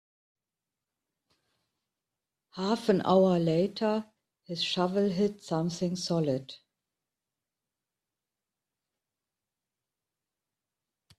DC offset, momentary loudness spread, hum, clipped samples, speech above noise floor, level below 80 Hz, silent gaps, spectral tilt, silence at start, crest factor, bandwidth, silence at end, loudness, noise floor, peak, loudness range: under 0.1%; 12 LU; none; under 0.1%; 62 dB; -72 dBFS; none; -6 dB/octave; 2.55 s; 22 dB; 12.5 kHz; 4.65 s; -29 LUFS; -90 dBFS; -10 dBFS; 8 LU